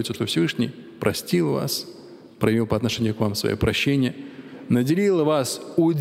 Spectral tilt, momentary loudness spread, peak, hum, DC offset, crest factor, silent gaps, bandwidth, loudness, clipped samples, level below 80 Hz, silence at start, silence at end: -5.5 dB/octave; 8 LU; -4 dBFS; none; under 0.1%; 18 dB; none; 16 kHz; -23 LUFS; under 0.1%; -48 dBFS; 0 s; 0 s